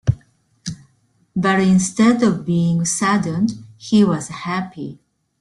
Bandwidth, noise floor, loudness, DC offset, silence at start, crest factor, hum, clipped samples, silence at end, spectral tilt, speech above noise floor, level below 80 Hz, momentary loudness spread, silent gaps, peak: 12 kHz; -60 dBFS; -18 LUFS; under 0.1%; 0.05 s; 16 dB; none; under 0.1%; 0.45 s; -5.5 dB/octave; 43 dB; -48 dBFS; 17 LU; none; -2 dBFS